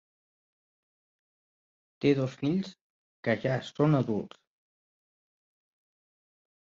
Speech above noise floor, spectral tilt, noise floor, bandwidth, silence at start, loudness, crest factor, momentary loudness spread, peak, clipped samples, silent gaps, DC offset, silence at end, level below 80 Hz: over 62 dB; -8 dB/octave; under -90 dBFS; 7.6 kHz; 2 s; -29 LUFS; 22 dB; 10 LU; -12 dBFS; under 0.1%; 2.81-3.23 s; under 0.1%; 2.4 s; -70 dBFS